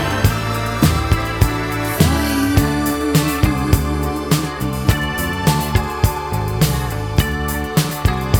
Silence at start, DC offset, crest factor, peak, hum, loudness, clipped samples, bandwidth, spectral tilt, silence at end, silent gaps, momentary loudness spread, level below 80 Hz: 0 s; 0.3%; 16 dB; 0 dBFS; none; -18 LUFS; under 0.1%; over 20 kHz; -5.5 dB/octave; 0 s; none; 5 LU; -26 dBFS